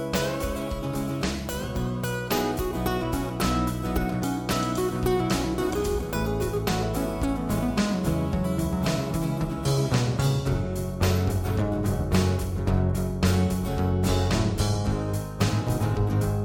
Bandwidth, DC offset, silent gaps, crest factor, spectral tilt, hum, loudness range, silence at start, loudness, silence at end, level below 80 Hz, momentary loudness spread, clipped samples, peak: 17.5 kHz; under 0.1%; none; 16 dB; -6 dB/octave; none; 2 LU; 0 s; -26 LUFS; 0 s; -36 dBFS; 5 LU; under 0.1%; -10 dBFS